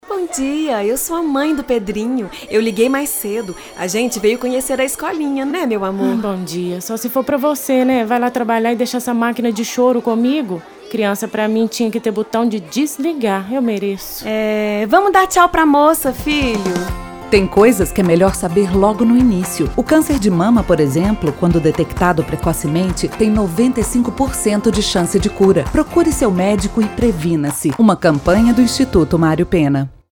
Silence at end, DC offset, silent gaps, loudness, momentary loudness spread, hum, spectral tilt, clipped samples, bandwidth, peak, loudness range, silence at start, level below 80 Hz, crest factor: 0.2 s; under 0.1%; none; -15 LUFS; 8 LU; none; -5.5 dB/octave; under 0.1%; over 20 kHz; 0 dBFS; 5 LU; 0.05 s; -32 dBFS; 14 dB